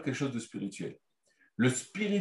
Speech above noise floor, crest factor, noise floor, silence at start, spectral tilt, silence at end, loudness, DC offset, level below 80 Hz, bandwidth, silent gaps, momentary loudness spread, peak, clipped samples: 38 dB; 20 dB; -71 dBFS; 0 s; -5 dB/octave; 0 s; -34 LUFS; under 0.1%; -76 dBFS; 12 kHz; none; 13 LU; -14 dBFS; under 0.1%